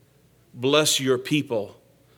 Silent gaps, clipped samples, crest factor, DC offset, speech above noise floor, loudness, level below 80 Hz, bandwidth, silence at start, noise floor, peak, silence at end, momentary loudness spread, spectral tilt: none; under 0.1%; 22 dB; under 0.1%; 36 dB; -22 LUFS; -70 dBFS; 18 kHz; 0.55 s; -58 dBFS; -4 dBFS; 0.45 s; 11 LU; -3.5 dB/octave